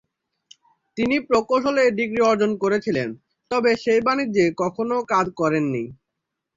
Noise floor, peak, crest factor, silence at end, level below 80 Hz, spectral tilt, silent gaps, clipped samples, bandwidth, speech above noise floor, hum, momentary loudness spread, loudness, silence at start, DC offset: -81 dBFS; -6 dBFS; 16 dB; 0.65 s; -58 dBFS; -5.5 dB/octave; none; under 0.1%; 7.8 kHz; 61 dB; none; 7 LU; -21 LUFS; 0.95 s; under 0.1%